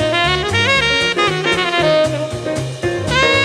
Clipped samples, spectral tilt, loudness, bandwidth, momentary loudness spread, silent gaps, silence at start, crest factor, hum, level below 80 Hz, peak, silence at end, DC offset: under 0.1%; -4 dB/octave; -15 LUFS; 14 kHz; 9 LU; none; 0 s; 12 dB; none; -36 dBFS; -4 dBFS; 0 s; under 0.1%